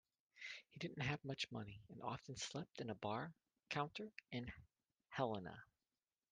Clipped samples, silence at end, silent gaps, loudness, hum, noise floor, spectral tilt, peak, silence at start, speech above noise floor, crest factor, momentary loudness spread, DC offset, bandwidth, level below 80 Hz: under 0.1%; 0.7 s; none; -48 LUFS; none; under -90 dBFS; -4.5 dB/octave; -26 dBFS; 0.35 s; over 42 dB; 22 dB; 11 LU; under 0.1%; 9.6 kHz; -76 dBFS